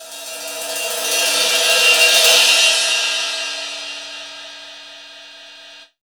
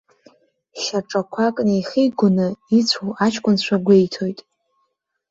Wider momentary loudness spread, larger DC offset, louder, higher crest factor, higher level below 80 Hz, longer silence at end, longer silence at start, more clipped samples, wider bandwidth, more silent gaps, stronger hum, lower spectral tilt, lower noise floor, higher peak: first, 23 LU vs 11 LU; neither; first, -13 LUFS vs -19 LUFS; about the same, 18 dB vs 18 dB; second, -70 dBFS vs -62 dBFS; second, 0.25 s vs 0.95 s; second, 0 s vs 0.75 s; neither; first, over 20 kHz vs 7.8 kHz; neither; neither; second, 3.5 dB/octave vs -5.5 dB/octave; second, -41 dBFS vs -72 dBFS; about the same, 0 dBFS vs -2 dBFS